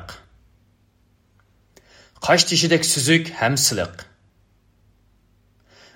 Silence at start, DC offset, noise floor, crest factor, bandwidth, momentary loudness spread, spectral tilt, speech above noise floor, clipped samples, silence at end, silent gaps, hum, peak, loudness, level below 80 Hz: 0 s; under 0.1%; -61 dBFS; 22 dB; 16 kHz; 13 LU; -3 dB/octave; 42 dB; under 0.1%; 1.9 s; none; 50 Hz at -65 dBFS; -2 dBFS; -18 LUFS; -58 dBFS